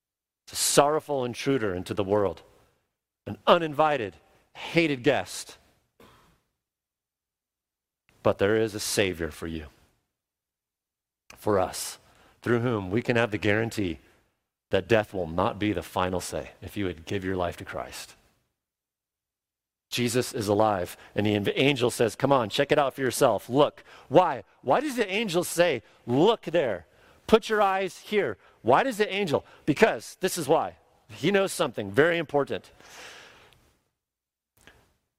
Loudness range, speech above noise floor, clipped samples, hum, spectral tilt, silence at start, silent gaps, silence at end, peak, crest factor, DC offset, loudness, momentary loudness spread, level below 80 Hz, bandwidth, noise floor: 8 LU; over 64 dB; under 0.1%; none; -4.5 dB/octave; 0.5 s; none; 1.95 s; -2 dBFS; 26 dB; under 0.1%; -26 LUFS; 13 LU; -60 dBFS; 16 kHz; under -90 dBFS